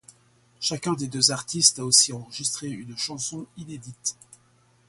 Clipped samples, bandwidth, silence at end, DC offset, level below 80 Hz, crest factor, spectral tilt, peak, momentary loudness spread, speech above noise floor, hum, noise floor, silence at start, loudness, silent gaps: under 0.1%; 12 kHz; 0.75 s; under 0.1%; -66 dBFS; 26 dB; -2 dB/octave; -2 dBFS; 18 LU; 35 dB; none; -61 dBFS; 0.6 s; -23 LUFS; none